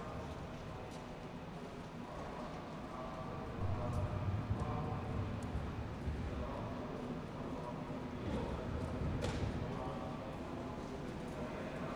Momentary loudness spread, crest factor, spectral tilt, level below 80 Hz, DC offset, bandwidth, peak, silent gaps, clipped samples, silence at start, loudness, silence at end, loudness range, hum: 8 LU; 18 dB; -7 dB/octave; -50 dBFS; under 0.1%; 13 kHz; -24 dBFS; none; under 0.1%; 0 s; -43 LUFS; 0 s; 4 LU; none